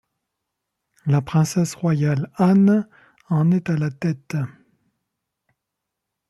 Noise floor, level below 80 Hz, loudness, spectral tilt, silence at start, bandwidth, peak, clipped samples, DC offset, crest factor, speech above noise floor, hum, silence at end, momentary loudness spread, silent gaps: -82 dBFS; -60 dBFS; -20 LUFS; -7.5 dB/octave; 1.05 s; 12.5 kHz; -6 dBFS; under 0.1%; under 0.1%; 16 dB; 62 dB; none; 1.8 s; 12 LU; none